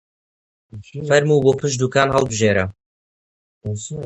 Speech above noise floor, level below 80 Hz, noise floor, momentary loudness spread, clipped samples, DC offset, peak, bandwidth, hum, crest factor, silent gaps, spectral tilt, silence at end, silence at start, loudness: over 72 dB; -46 dBFS; under -90 dBFS; 15 LU; under 0.1%; under 0.1%; 0 dBFS; 10.5 kHz; none; 20 dB; 2.86-3.61 s; -5 dB/octave; 0 s; 0.75 s; -18 LUFS